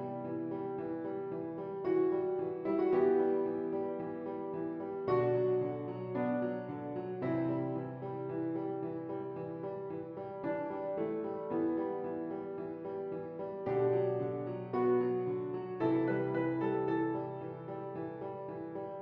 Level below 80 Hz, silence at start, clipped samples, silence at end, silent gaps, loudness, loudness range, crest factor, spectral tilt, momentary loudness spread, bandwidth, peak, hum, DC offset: -76 dBFS; 0 s; under 0.1%; 0 s; none; -36 LUFS; 5 LU; 16 dB; -8 dB/octave; 10 LU; 5.2 kHz; -20 dBFS; none; under 0.1%